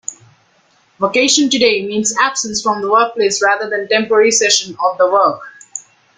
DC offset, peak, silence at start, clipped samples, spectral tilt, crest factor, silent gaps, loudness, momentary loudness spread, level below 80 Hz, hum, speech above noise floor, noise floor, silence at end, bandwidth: under 0.1%; 0 dBFS; 0.1 s; under 0.1%; -1.5 dB/octave; 16 dB; none; -13 LUFS; 17 LU; -60 dBFS; none; 41 dB; -55 dBFS; 0.4 s; 9.8 kHz